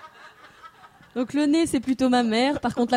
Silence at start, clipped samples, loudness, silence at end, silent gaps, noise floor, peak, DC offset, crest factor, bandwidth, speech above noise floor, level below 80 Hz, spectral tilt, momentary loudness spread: 0.05 s; under 0.1%; -23 LUFS; 0 s; none; -49 dBFS; -6 dBFS; under 0.1%; 18 dB; 13.5 kHz; 27 dB; -56 dBFS; -4.5 dB/octave; 8 LU